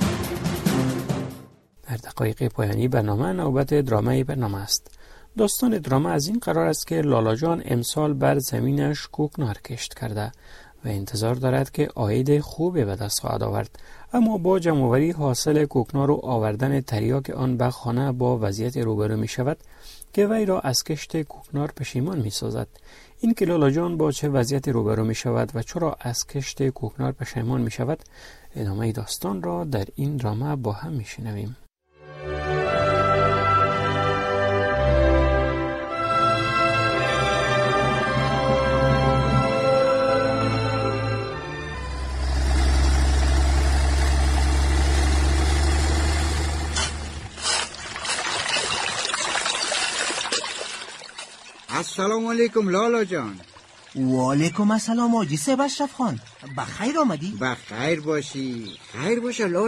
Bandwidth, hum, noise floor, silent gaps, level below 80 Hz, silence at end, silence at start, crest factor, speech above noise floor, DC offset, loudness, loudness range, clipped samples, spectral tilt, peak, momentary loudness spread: 15 kHz; none; -48 dBFS; none; -30 dBFS; 0 s; 0 s; 16 dB; 24 dB; under 0.1%; -23 LUFS; 6 LU; under 0.1%; -5 dB/octave; -8 dBFS; 10 LU